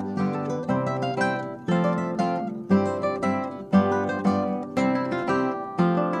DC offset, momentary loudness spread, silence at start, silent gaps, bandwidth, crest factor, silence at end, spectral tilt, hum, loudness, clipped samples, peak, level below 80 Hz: under 0.1%; 5 LU; 0 s; none; 9.4 kHz; 18 dB; 0 s; -7.5 dB/octave; none; -25 LUFS; under 0.1%; -8 dBFS; -64 dBFS